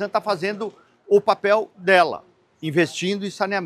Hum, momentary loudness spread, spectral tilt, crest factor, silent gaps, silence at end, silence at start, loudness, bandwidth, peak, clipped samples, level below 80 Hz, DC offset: none; 14 LU; -5 dB/octave; 20 dB; none; 0 s; 0 s; -21 LUFS; 13 kHz; -2 dBFS; under 0.1%; -74 dBFS; under 0.1%